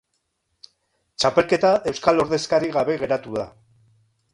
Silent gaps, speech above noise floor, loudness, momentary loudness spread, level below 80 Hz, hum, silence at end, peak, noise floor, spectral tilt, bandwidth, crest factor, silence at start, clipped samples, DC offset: none; 53 dB; -21 LUFS; 12 LU; -56 dBFS; none; 0.85 s; -2 dBFS; -74 dBFS; -4.5 dB/octave; 11.5 kHz; 20 dB; 1.2 s; under 0.1%; under 0.1%